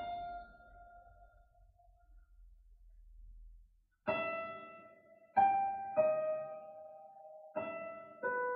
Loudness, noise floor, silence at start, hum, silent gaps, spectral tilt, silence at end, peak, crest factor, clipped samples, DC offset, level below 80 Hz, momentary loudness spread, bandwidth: -37 LUFS; -66 dBFS; 0 s; none; none; -7.5 dB/octave; 0 s; -18 dBFS; 22 dB; under 0.1%; under 0.1%; -64 dBFS; 25 LU; 5 kHz